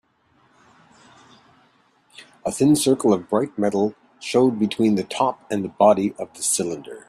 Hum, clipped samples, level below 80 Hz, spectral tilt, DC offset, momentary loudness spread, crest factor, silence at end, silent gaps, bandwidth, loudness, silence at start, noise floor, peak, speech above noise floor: none; under 0.1%; -62 dBFS; -5 dB/octave; under 0.1%; 11 LU; 20 dB; 0.1 s; none; 14.5 kHz; -21 LUFS; 2.2 s; -61 dBFS; -2 dBFS; 41 dB